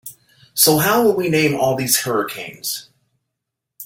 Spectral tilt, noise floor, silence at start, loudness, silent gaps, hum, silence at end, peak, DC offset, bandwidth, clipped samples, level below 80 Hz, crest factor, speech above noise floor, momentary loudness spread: -3.5 dB/octave; -80 dBFS; 0.05 s; -17 LUFS; none; none; 0 s; 0 dBFS; under 0.1%; 17 kHz; under 0.1%; -58 dBFS; 20 dB; 63 dB; 14 LU